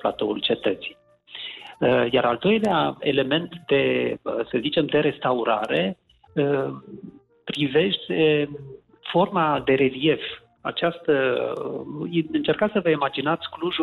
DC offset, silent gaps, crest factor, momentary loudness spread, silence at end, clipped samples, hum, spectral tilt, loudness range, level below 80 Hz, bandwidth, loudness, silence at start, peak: under 0.1%; none; 14 dB; 14 LU; 0 s; under 0.1%; none; -7 dB/octave; 2 LU; -60 dBFS; 11.5 kHz; -23 LUFS; 0 s; -10 dBFS